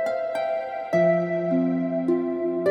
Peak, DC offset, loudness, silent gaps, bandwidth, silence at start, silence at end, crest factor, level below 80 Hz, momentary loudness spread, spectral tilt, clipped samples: -10 dBFS; under 0.1%; -24 LUFS; none; 10 kHz; 0 s; 0 s; 14 dB; -68 dBFS; 6 LU; -8.5 dB/octave; under 0.1%